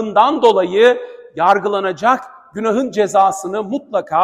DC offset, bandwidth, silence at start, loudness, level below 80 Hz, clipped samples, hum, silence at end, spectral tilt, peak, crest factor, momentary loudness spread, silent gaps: under 0.1%; 13.5 kHz; 0 s; -15 LUFS; -62 dBFS; under 0.1%; none; 0 s; -4.5 dB/octave; 0 dBFS; 16 dB; 10 LU; none